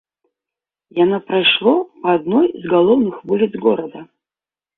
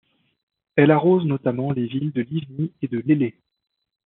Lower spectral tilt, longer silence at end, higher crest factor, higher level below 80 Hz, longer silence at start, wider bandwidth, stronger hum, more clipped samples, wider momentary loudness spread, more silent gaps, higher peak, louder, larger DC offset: first, -9.5 dB/octave vs -7.5 dB/octave; about the same, 0.75 s vs 0.75 s; about the same, 16 dB vs 18 dB; first, -62 dBFS vs -68 dBFS; first, 0.95 s vs 0.75 s; about the same, 4.1 kHz vs 4.1 kHz; neither; neither; second, 6 LU vs 11 LU; neither; about the same, -2 dBFS vs -4 dBFS; first, -16 LUFS vs -21 LUFS; neither